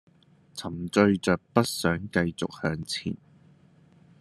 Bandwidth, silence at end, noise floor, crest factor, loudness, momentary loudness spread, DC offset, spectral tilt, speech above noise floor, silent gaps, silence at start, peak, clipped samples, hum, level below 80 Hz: 13 kHz; 1.05 s; -59 dBFS; 24 dB; -27 LUFS; 14 LU; under 0.1%; -5.5 dB/octave; 32 dB; none; 0.55 s; -4 dBFS; under 0.1%; none; -60 dBFS